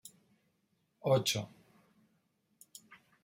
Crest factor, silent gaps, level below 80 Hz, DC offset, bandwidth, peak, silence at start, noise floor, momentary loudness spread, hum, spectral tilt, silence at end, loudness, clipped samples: 22 dB; none; -78 dBFS; under 0.1%; 16 kHz; -16 dBFS; 0.05 s; -78 dBFS; 25 LU; none; -4 dB/octave; 0.3 s; -33 LUFS; under 0.1%